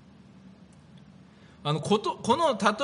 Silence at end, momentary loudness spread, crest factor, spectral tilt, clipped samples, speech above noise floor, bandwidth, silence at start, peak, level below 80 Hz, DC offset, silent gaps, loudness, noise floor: 0 s; 7 LU; 22 dB; -5 dB/octave; under 0.1%; 27 dB; 10.5 kHz; 0.45 s; -8 dBFS; -66 dBFS; under 0.1%; none; -26 LUFS; -53 dBFS